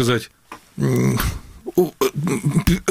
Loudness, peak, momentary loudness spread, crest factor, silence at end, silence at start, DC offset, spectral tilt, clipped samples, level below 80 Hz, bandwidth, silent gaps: -21 LUFS; -2 dBFS; 12 LU; 18 dB; 0 s; 0 s; under 0.1%; -6 dB/octave; under 0.1%; -34 dBFS; 17 kHz; none